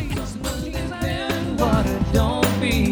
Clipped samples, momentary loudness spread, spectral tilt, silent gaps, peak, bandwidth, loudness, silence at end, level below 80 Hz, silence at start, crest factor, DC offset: under 0.1%; 8 LU; -5.5 dB/octave; none; -4 dBFS; over 20 kHz; -22 LUFS; 0 s; -28 dBFS; 0 s; 18 dB; under 0.1%